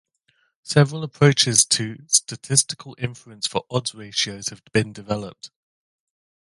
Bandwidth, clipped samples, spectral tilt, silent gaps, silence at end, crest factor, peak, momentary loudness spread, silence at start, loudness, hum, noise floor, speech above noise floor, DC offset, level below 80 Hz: 11.5 kHz; under 0.1%; -3 dB/octave; none; 1 s; 24 dB; 0 dBFS; 14 LU; 0.65 s; -21 LUFS; none; -67 dBFS; 45 dB; under 0.1%; -58 dBFS